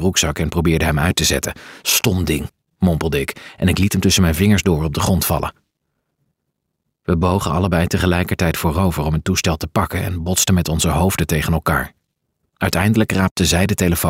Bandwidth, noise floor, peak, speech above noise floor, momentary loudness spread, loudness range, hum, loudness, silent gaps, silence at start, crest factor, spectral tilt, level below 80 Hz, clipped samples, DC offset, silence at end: 16.5 kHz; -75 dBFS; -2 dBFS; 58 dB; 7 LU; 3 LU; none; -17 LUFS; 13.31-13.36 s; 0 s; 14 dB; -4.5 dB/octave; -32 dBFS; under 0.1%; under 0.1%; 0 s